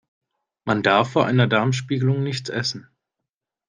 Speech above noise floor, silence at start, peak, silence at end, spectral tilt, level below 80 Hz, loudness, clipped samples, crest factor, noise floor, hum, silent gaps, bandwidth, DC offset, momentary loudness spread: 64 dB; 0.65 s; -2 dBFS; 0.9 s; -6 dB/octave; -62 dBFS; -21 LUFS; under 0.1%; 20 dB; -84 dBFS; none; none; 9.6 kHz; under 0.1%; 9 LU